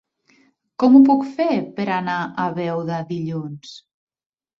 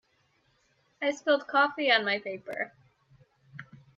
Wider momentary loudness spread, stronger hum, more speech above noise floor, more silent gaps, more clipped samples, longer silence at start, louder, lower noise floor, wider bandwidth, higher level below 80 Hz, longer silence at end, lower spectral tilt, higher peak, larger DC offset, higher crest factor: second, 21 LU vs 24 LU; neither; about the same, 40 dB vs 42 dB; neither; neither; second, 0.8 s vs 1 s; first, -19 LUFS vs -28 LUFS; second, -59 dBFS vs -70 dBFS; about the same, 7 kHz vs 7.6 kHz; first, -66 dBFS vs -78 dBFS; first, 0.8 s vs 0.35 s; first, -8 dB/octave vs -3.5 dB/octave; first, -2 dBFS vs -10 dBFS; neither; about the same, 18 dB vs 22 dB